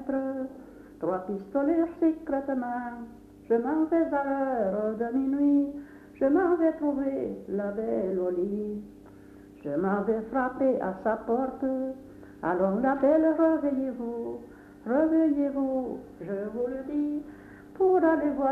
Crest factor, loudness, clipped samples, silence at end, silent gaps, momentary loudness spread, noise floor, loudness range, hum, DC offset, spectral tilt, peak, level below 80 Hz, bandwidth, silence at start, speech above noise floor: 16 dB; -28 LUFS; under 0.1%; 0 s; none; 15 LU; -49 dBFS; 4 LU; none; under 0.1%; -9.5 dB/octave; -12 dBFS; -60 dBFS; 4.1 kHz; 0 s; 23 dB